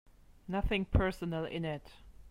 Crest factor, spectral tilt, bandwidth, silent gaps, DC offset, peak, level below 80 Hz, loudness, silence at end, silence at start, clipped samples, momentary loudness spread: 22 dB; -7.5 dB/octave; 15 kHz; none; under 0.1%; -14 dBFS; -42 dBFS; -35 LUFS; 0 s; 0.3 s; under 0.1%; 11 LU